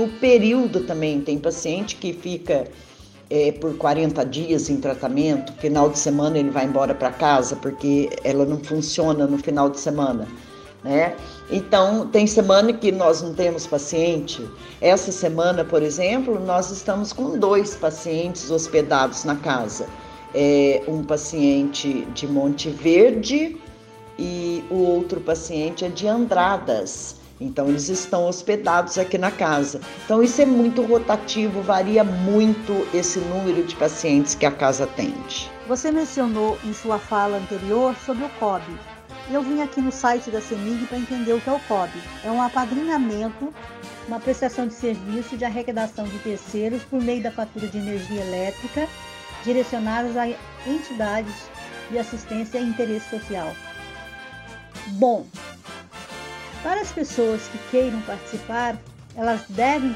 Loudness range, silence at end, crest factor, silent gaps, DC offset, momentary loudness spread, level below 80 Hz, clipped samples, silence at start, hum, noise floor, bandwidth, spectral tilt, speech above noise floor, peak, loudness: 8 LU; 0 s; 18 dB; none; under 0.1%; 14 LU; -50 dBFS; under 0.1%; 0 s; none; -43 dBFS; 12.5 kHz; -4.5 dB/octave; 22 dB; -2 dBFS; -22 LUFS